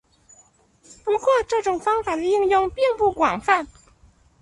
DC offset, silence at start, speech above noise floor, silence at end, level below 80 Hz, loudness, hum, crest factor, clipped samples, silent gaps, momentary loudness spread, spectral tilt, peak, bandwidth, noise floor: under 0.1%; 1.05 s; 36 dB; 0.75 s; -52 dBFS; -21 LUFS; none; 20 dB; under 0.1%; none; 4 LU; -4 dB/octave; -4 dBFS; 11.5 kHz; -57 dBFS